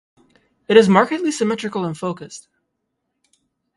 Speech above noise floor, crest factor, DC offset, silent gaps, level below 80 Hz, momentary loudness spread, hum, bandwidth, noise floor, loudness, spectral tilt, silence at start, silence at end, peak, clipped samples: 58 dB; 20 dB; under 0.1%; none; -62 dBFS; 21 LU; none; 11.5 kHz; -75 dBFS; -17 LUFS; -5.5 dB/octave; 0.7 s; 1.35 s; 0 dBFS; under 0.1%